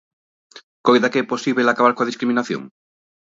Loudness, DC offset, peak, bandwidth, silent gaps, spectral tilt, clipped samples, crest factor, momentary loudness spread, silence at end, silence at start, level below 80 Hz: -19 LUFS; under 0.1%; 0 dBFS; 7.8 kHz; 0.63-0.84 s; -5 dB/octave; under 0.1%; 20 dB; 7 LU; 0.65 s; 0.55 s; -70 dBFS